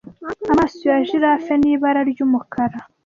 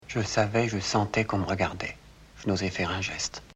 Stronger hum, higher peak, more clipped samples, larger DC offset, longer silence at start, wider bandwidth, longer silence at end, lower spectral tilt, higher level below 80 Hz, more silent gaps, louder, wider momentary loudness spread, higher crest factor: neither; first, -4 dBFS vs -10 dBFS; neither; neither; about the same, 0.05 s vs 0 s; second, 7.2 kHz vs 10 kHz; first, 0.25 s vs 0.05 s; first, -7 dB/octave vs -4.5 dB/octave; about the same, -48 dBFS vs -50 dBFS; neither; first, -18 LUFS vs -28 LUFS; second, 7 LU vs 10 LU; second, 14 dB vs 20 dB